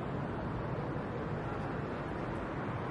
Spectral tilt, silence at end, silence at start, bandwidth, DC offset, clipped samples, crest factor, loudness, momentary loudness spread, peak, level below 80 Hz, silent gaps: -8.5 dB/octave; 0 s; 0 s; 11 kHz; under 0.1%; under 0.1%; 14 dB; -38 LUFS; 1 LU; -24 dBFS; -52 dBFS; none